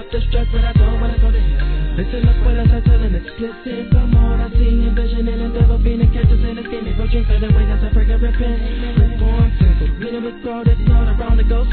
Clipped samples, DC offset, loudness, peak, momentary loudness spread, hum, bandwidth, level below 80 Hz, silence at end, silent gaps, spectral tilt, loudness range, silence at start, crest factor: under 0.1%; under 0.1%; -17 LUFS; 0 dBFS; 8 LU; none; 4.4 kHz; -14 dBFS; 0 s; none; -11.5 dB/octave; 1 LU; 0 s; 12 dB